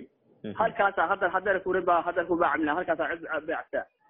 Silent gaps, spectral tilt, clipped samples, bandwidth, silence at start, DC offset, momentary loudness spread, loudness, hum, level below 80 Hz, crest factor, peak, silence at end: none; -3 dB/octave; under 0.1%; 3.9 kHz; 0 s; under 0.1%; 7 LU; -27 LUFS; none; -62 dBFS; 18 dB; -10 dBFS; 0.25 s